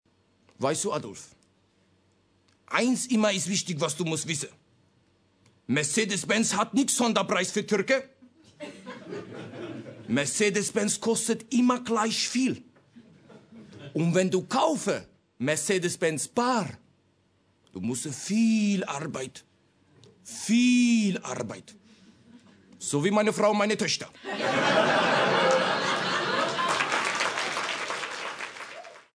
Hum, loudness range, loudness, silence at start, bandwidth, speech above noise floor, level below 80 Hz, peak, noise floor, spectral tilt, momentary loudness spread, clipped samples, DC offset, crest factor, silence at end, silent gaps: none; 5 LU; -26 LUFS; 0.6 s; 11 kHz; 41 dB; -74 dBFS; -8 dBFS; -67 dBFS; -3.5 dB/octave; 17 LU; under 0.1%; under 0.1%; 20 dB; 0.15 s; none